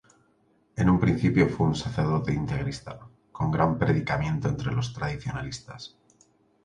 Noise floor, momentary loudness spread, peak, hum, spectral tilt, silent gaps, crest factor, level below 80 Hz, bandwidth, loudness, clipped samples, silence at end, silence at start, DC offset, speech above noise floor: -65 dBFS; 18 LU; -8 dBFS; none; -7 dB/octave; none; 20 dB; -44 dBFS; 10 kHz; -26 LUFS; under 0.1%; 0.75 s; 0.75 s; under 0.1%; 39 dB